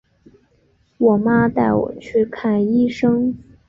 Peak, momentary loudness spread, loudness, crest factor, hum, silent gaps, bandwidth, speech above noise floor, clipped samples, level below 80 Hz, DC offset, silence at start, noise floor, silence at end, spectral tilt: -4 dBFS; 5 LU; -18 LUFS; 16 dB; none; none; 7.2 kHz; 43 dB; under 0.1%; -48 dBFS; under 0.1%; 1 s; -59 dBFS; 0.3 s; -8.5 dB/octave